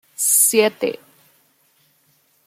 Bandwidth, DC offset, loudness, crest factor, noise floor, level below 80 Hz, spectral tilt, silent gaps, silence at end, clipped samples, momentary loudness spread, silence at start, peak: 16 kHz; under 0.1%; -15 LUFS; 20 dB; -61 dBFS; -76 dBFS; -1 dB/octave; none; 1.55 s; under 0.1%; 14 LU; 0.2 s; -2 dBFS